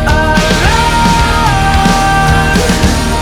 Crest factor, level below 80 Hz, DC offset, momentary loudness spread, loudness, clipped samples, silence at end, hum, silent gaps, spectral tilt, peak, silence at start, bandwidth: 8 dB; -16 dBFS; under 0.1%; 1 LU; -9 LUFS; under 0.1%; 0 s; none; none; -4.5 dB/octave; 0 dBFS; 0 s; 18.5 kHz